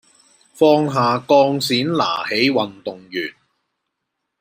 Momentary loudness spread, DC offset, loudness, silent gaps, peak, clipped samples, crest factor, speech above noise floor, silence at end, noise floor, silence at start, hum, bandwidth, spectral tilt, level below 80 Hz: 12 LU; under 0.1%; -17 LUFS; none; -2 dBFS; under 0.1%; 18 dB; 60 dB; 1.1 s; -77 dBFS; 0.55 s; none; 16 kHz; -5 dB/octave; -66 dBFS